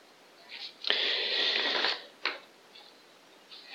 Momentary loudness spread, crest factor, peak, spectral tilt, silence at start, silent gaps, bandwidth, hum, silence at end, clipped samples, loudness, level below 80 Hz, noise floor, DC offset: 20 LU; 28 dB; -6 dBFS; 0 dB/octave; 0.4 s; none; 16.5 kHz; none; 0 s; under 0.1%; -29 LUFS; under -90 dBFS; -57 dBFS; under 0.1%